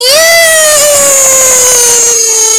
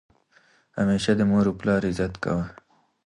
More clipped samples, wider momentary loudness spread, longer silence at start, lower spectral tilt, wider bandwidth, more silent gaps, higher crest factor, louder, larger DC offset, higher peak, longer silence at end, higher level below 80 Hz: first, 5% vs under 0.1%; second, 1 LU vs 8 LU; second, 0 s vs 0.75 s; second, 1.5 dB/octave vs -6.5 dB/octave; first, over 20 kHz vs 11 kHz; neither; second, 6 dB vs 16 dB; first, -2 LUFS vs -24 LUFS; first, 2% vs under 0.1%; first, 0 dBFS vs -8 dBFS; second, 0 s vs 0.55 s; first, -42 dBFS vs -48 dBFS